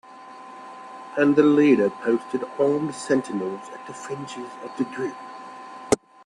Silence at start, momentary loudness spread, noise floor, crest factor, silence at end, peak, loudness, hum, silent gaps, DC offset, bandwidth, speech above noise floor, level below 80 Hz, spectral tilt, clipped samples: 0.1 s; 23 LU; -43 dBFS; 22 dB; 0.3 s; -2 dBFS; -23 LUFS; none; none; under 0.1%; 11.5 kHz; 20 dB; -64 dBFS; -5.5 dB/octave; under 0.1%